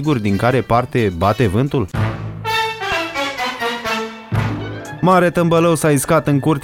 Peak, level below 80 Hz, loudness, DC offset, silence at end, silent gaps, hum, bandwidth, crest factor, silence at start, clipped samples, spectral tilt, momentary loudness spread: -2 dBFS; -40 dBFS; -17 LUFS; under 0.1%; 0 s; none; none; 17 kHz; 14 dB; 0 s; under 0.1%; -5.5 dB/octave; 9 LU